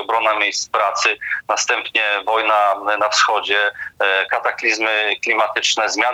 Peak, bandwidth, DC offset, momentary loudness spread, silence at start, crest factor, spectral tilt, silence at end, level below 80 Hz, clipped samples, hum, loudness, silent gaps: -2 dBFS; 16.5 kHz; under 0.1%; 3 LU; 0 s; 16 dB; 0.5 dB/octave; 0 s; -66 dBFS; under 0.1%; none; -17 LUFS; none